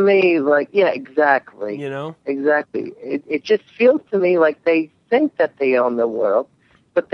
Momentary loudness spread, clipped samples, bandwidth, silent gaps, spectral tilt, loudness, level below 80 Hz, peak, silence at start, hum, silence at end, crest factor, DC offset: 12 LU; under 0.1%; 6.4 kHz; none; -7 dB/octave; -18 LUFS; -74 dBFS; -2 dBFS; 0 s; none; 0.15 s; 16 dB; under 0.1%